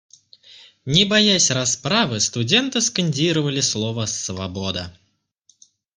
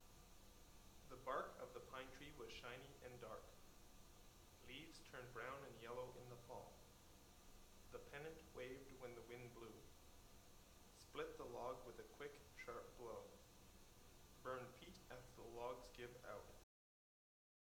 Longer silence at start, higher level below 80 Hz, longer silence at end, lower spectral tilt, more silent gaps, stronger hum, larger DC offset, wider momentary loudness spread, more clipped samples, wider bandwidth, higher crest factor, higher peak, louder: first, 0.5 s vs 0 s; first, -56 dBFS vs -70 dBFS; about the same, 1.05 s vs 1 s; about the same, -3 dB/octave vs -4 dB/octave; neither; neither; neither; about the same, 12 LU vs 14 LU; neither; second, 10.5 kHz vs 19.5 kHz; about the same, 20 dB vs 24 dB; first, -2 dBFS vs -34 dBFS; first, -19 LUFS vs -58 LUFS